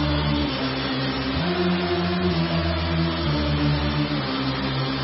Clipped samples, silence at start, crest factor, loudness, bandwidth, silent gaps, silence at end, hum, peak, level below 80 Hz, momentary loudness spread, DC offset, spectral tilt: under 0.1%; 0 s; 12 dB; -23 LUFS; 5.8 kHz; none; 0 s; none; -10 dBFS; -34 dBFS; 2 LU; under 0.1%; -10 dB/octave